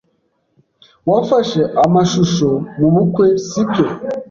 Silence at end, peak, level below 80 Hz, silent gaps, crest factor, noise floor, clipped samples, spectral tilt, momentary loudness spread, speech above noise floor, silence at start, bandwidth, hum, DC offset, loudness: 0.05 s; -2 dBFS; -50 dBFS; none; 12 dB; -64 dBFS; under 0.1%; -6.5 dB/octave; 5 LU; 50 dB; 1.05 s; 7.4 kHz; none; under 0.1%; -15 LUFS